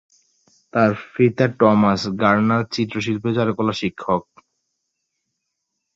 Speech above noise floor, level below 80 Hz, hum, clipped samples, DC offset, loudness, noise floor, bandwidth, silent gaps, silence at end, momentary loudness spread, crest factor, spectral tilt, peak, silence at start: 59 dB; -54 dBFS; none; under 0.1%; under 0.1%; -19 LUFS; -77 dBFS; 7.8 kHz; none; 1.75 s; 8 LU; 18 dB; -7 dB/octave; -2 dBFS; 0.75 s